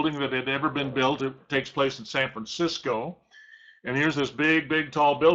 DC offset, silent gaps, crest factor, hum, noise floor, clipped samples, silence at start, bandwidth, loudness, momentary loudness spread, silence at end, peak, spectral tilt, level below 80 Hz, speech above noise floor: under 0.1%; none; 18 dB; none; -52 dBFS; under 0.1%; 0 s; 8 kHz; -26 LUFS; 8 LU; 0 s; -8 dBFS; -5 dB/octave; -62 dBFS; 26 dB